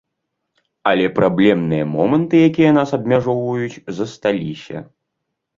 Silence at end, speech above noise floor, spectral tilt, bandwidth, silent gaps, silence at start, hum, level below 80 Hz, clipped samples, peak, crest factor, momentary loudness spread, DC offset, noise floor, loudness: 0.75 s; 60 dB; -7.5 dB/octave; 7.4 kHz; none; 0.85 s; none; -54 dBFS; under 0.1%; -2 dBFS; 16 dB; 13 LU; under 0.1%; -76 dBFS; -17 LUFS